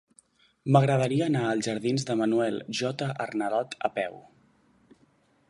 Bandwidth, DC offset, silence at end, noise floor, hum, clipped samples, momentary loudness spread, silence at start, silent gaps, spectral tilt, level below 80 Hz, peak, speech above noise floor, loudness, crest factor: 11.5 kHz; under 0.1%; 1.3 s; -65 dBFS; none; under 0.1%; 8 LU; 0.65 s; none; -6 dB/octave; -70 dBFS; -6 dBFS; 38 dB; -27 LUFS; 22 dB